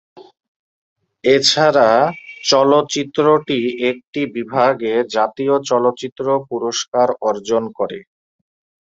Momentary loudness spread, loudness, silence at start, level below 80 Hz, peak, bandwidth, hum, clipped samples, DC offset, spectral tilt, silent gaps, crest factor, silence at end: 11 LU; -17 LUFS; 0.15 s; -62 dBFS; 0 dBFS; 8.2 kHz; none; under 0.1%; under 0.1%; -3.5 dB/octave; 0.48-0.96 s, 4.07-4.13 s, 6.12-6.16 s, 6.88-6.92 s; 18 dB; 0.8 s